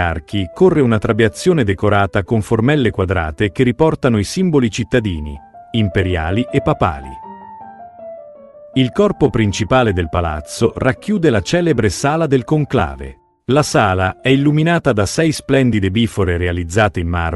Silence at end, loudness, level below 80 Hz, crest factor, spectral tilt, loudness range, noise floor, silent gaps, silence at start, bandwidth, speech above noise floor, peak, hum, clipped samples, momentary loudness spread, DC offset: 0 s; -16 LUFS; -36 dBFS; 16 dB; -6 dB/octave; 4 LU; -38 dBFS; none; 0 s; 12.5 kHz; 24 dB; 0 dBFS; none; under 0.1%; 16 LU; under 0.1%